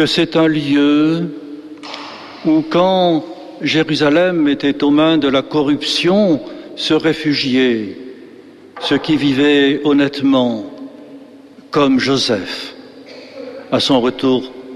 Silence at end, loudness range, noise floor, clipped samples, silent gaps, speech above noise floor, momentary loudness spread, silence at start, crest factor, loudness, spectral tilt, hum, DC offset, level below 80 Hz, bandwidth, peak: 0 s; 3 LU; -39 dBFS; under 0.1%; none; 26 dB; 18 LU; 0 s; 12 dB; -15 LUFS; -5.5 dB/octave; none; under 0.1%; -52 dBFS; 11.5 kHz; -2 dBFS